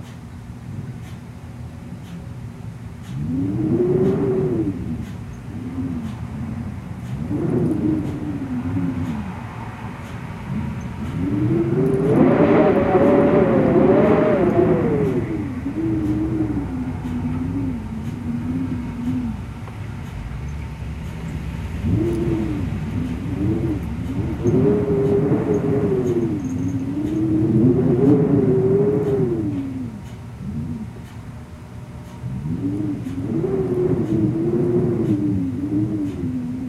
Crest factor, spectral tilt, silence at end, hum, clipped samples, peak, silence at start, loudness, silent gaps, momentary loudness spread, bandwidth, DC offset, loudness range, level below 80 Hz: 18 dB; -9 dB/octave; 0 s; none; under 0.1%; -2 dBFS; 0 s; -21 LUFS; none; 18 LU; 13 kHz; under 0.1%; 11 LU; -38 dBFS